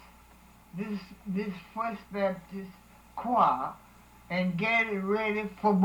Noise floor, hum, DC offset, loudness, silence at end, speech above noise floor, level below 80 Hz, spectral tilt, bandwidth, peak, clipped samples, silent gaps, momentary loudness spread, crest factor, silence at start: -56 dBFS; none; under 0.1%; -30 LUFS; 0 s; 26 dB; -60 dBFS; -7 dB/octave; 19 kHz; -12 dBFS; under 0.1%; none; 17 LU; 20 dB; 0.75 s